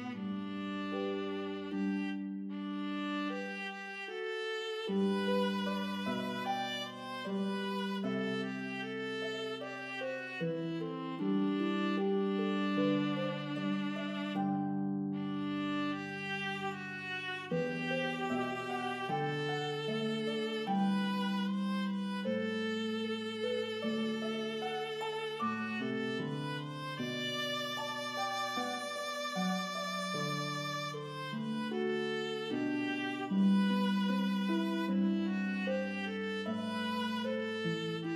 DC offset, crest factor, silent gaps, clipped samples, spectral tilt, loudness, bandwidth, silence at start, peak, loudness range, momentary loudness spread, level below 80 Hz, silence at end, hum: under 0.1%; 14 dB; none; under 0.1%; -5.5 dB/octave; -36 LUFS; 14 kHz; 0 s; -22 dBFS; 5 LU; 7 LU; -84 dBFS; 0 s; none